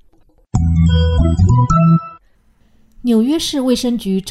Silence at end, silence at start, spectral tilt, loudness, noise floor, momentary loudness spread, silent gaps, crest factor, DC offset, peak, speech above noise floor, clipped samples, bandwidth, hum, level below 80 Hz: 0 s; 0.55 s; -7 dB/octave; -15 LUFS; -53 dBFS; 7 LU; none; 12 dB; under 0.1%; -2 dBFS; 39 dB; under 0.1%; 13.5 kHz; none; -26 dBFS